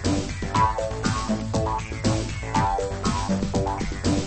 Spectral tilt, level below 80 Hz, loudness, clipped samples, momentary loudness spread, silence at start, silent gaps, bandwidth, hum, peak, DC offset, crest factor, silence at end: -5.5 dB/octave; -34 dBFS; -25 LUFS; under 0.1%; 4 LU; 0 s; none; 8.8 kHz; none; -8 dBFS; 0.1%; 16 dB; 0 s